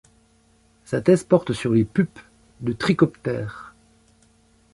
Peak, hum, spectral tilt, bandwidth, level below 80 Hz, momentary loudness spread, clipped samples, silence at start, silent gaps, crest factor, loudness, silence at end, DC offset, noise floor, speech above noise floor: -4 dBFS; none; -7 dB/octave; 11.5 kHz; -54 dBFS; 12 LU; under 0.1%; 0.9 s; none; 20 dB; -22 LUFS; 1.05 s; under 0.1%; -59 dBFS; 38 dB